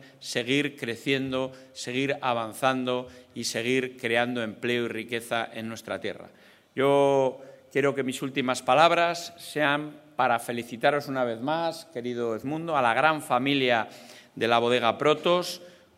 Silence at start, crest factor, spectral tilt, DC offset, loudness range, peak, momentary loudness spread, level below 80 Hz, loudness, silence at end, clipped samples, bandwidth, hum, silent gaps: 0 s; 22 dB; -4.5 dB/octave; under 0.1%; 4 LU; -4 dBFS; 12 LU; -74 dBFS; -26 LUFS; 0.3 s; under 0.1%; 16 kHz; none; none